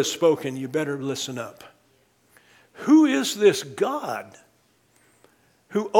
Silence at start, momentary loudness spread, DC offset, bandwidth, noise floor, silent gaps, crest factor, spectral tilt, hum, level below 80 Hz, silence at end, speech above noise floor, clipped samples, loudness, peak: 0 s; 15 LU; under 0.1%; 17 kHz; -63 dBFS; none; 22 dB; -4.5 dB/octave; none; -74 dBFS; 0 s; 41 dB; under 0.1%; -23 LUFS; -2 dBFS